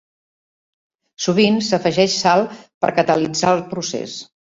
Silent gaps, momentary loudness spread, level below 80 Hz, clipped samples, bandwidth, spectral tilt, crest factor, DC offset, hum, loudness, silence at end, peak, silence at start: 2.74-2.81 s; 11 LU; -58 dBFS; under 0.1%; 7.8 kHz; -4.5 dB/octave; 18 dB; under 0.1%; none; -18 LUFS; 0.35 s; -2 dBFS; 1.2 s